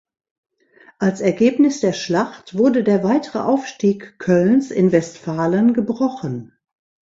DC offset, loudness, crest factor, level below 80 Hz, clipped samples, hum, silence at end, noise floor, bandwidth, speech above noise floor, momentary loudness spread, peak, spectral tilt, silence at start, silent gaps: under 0.1%; -18 LUFS; 18 dB; -60 dBFS; under 0.1%; none; 0.65 s; -51 dBFS; 7.8 kHz; 34 dB; 8 LU; -2 dBFS; -6.5 dB/octave; 1 s; none